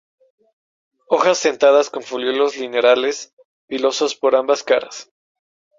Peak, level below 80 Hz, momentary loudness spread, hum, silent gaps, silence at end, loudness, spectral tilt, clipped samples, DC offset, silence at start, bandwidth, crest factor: -2 dBFS; -68 dBFS; 15 LU; none; 3.33-3.37 s, 3.45-3.68 s; 0.75 s; -17 LUFS; -2 dB/octave; under 0.1%; under 0.1%; 1.1 s; 7.6 kHz; 16 dB